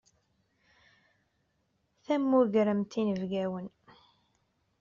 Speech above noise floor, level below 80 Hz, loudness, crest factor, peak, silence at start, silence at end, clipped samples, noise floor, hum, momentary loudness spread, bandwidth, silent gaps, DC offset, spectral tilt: 47 dB; -72 dBFS; -29 LUFS; 18 dB; -14 dBFS; 2.1 s; 1.1 s; under 0.1%; -76 dBFS; none; 12 LU; 7.2 kHz; none; under 0.1%; -6.5 dB/octave